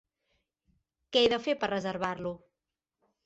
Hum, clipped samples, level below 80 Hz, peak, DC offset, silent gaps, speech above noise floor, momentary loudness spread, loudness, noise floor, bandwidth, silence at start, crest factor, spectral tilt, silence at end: none; under 0.1%; -66 dBFS; -12 dBFS; under 0.1%; none; 59 dB; 13 LU; -30 LUFS; -89 dBFS; 8.2 kHz; 1.1 s; 22 dB; -4.5 dB/octave; 0.9 s